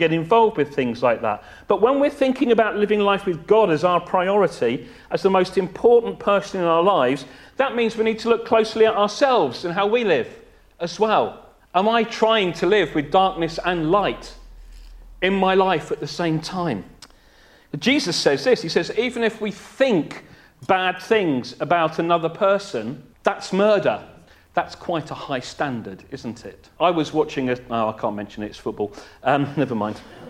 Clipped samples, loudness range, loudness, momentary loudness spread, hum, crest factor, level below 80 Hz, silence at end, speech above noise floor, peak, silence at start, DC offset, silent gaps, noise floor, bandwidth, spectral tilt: under 0.1%; 5 LU; -21 LUFS; 12 LU; none; 20 dB; -52 dBFS; 0 s; 31 dB; -2 dBFS; 0 s; under 0.1%; none; -52 dBFS; 12.5 kHz; -5.5 dB/octave